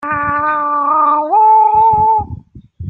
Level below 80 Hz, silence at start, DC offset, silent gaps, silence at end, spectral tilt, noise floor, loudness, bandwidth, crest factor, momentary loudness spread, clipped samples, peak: -42 dBFS; 0 s; under 0.1%; none; 0 s; -9 dB/octave; -32 dBFS; -11 LUFS; 4 kHz; 10 dB; 7 LU; under 0.1%; -2 dBFS